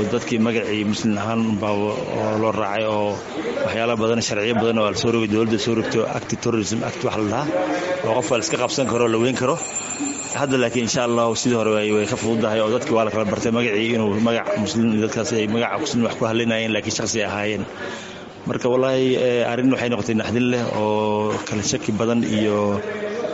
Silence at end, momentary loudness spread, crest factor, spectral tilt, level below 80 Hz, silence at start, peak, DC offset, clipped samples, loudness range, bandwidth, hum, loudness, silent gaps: 0 s; 5 LU; 16 dB; -4.5 dB/octave; -54 dBFS; 0 s; -4 dBFS; under 0.1%; under 0.1%; 2 LU; 8 kHz; none; -21 LUFS; none